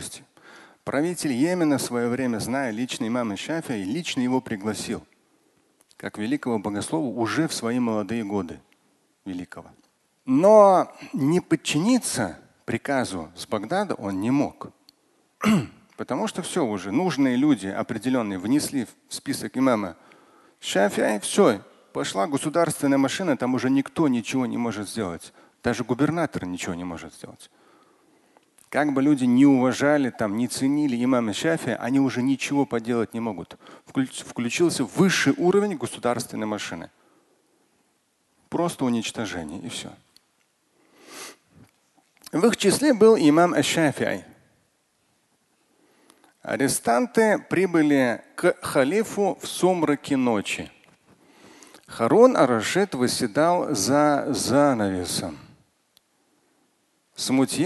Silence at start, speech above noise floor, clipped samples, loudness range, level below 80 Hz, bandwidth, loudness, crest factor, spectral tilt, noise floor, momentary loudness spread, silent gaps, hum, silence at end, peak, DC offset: 0 s; 46 dB; under 0.1%; 8 LU; -60 dBFS; 12.5 kHz; -23 LUFS; 22 dB; -5 dB/octave; -68 dBFS; 14 LU; none; none; 0 s; -2 dBFS; under 0.1%